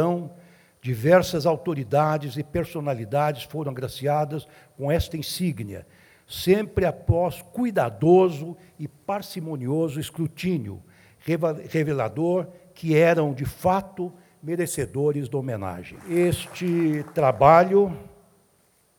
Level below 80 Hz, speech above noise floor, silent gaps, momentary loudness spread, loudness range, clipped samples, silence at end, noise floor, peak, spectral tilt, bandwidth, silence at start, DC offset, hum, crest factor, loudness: -50 dBFS; 40 dB; none; 16 LU; 6 LU; under 0.1%; 0.9 s; -63 dBFS; -2 dBFS; -6.5 dB/octave; 19.5 kHz; 0 s; under 0.1%; none; 22 dB; -24 LUFS